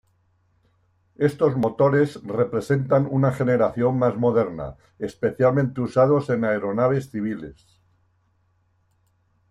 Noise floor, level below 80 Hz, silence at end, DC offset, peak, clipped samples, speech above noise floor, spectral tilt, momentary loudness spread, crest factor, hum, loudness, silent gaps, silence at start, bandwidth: -65 dBFS; -56 dBFS; 1.95 s; under 0.1%; -6 dBFS; under 0.1%; 44 dB; -8.5 dB/octave; 10 LU; 18 dB; none; -22 LUFS; none; 1.2 s; 12 kHz